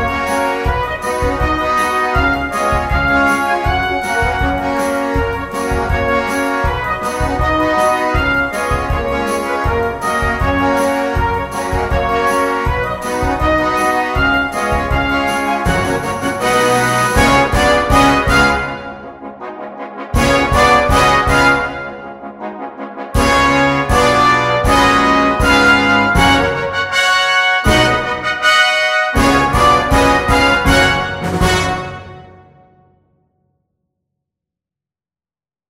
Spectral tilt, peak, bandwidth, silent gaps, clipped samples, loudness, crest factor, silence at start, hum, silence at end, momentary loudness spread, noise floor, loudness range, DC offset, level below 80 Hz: -4.5 dB/octave; 0 dBFS; 16.5 kHz; none; under 0.1%; -13 LUFS; 14 dB; 0 s; none; 3.4 s; 9 LU; under -90 dBFS; 5 LU; under 0.1%; -26 dBFS